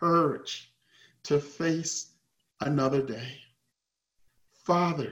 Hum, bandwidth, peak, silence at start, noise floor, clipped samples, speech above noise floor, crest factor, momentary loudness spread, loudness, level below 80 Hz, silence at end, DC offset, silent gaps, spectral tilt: none; 15.5 kHz; -12 dBFS; 0 s; -84 dBFS; under 0.1%; 55 dB; 18 dB; 16 LU; -29 LUFS; -68 dBFS; 0 s; under 0.1%; none; -5 dB/octave